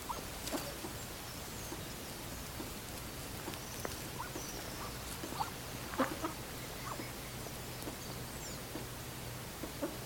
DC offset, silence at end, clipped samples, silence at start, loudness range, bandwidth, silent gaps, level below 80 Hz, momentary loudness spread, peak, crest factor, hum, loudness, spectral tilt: under 0.1%; 0 s; under 0.1%; 0 s; 3 LU; over 20 kHz; none; -54 dBFS; 4 LU; -20 dBFS; 22 dB; none; -42 LUFS; -3.5 dB/octave